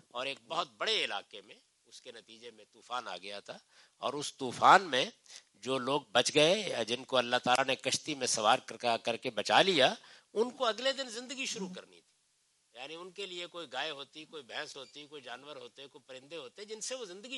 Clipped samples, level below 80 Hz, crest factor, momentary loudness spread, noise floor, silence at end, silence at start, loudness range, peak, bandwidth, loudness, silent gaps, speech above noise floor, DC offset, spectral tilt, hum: under 0.1%; -84 dBFS; 26 dB; 24 LU; -74 dBFS; 0 s; 0.15 s; 14 LU; -8 dBFS; 11.5 kHz; -31 LUFS; none; 40 dB; under 0.1%; -2 dB/octave; none